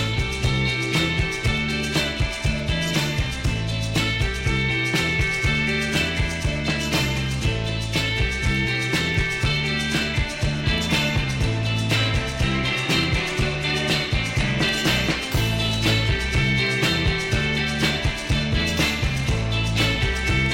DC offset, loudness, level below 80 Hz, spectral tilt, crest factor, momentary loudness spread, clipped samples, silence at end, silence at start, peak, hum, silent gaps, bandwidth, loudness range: under 0.1%; -22 LUFS; -30 dBFS; -4.5 dB/octave; 16 dB; 4 LU; under 0.1%; 0 s; 0 s; -6 dBFS; none; none; 16.5 kHz; 2 LU